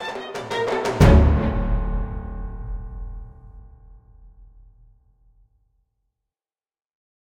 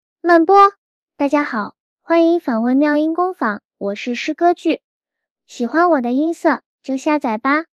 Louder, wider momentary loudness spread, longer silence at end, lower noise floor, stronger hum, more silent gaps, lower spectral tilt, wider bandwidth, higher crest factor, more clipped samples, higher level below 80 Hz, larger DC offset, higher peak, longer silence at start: second, -21 LUFS vs -17 LUFS; first, 22 LU vs 13 LU; first, 3.05 s vs 0.1 s; first, under -90 dBFS vs -80 dBFS; neither; second, none vs 0.78-1.06 s, 1.80-1.97 s, 3.65-3.69 s, 4.84-5.01 s, 5.31-5.36 s, 6.66-6.79 s; first, -7 dB/octave vs -5 dB/octave; first, 16 kHz vs 9 kHz; first, 22 dB vs 16 dB; neither; first, -26 dBFS vs -66 dBFS; neither; about the same, -2 dBFS vs 0 dBFS; second, 0 s vs 0.25 s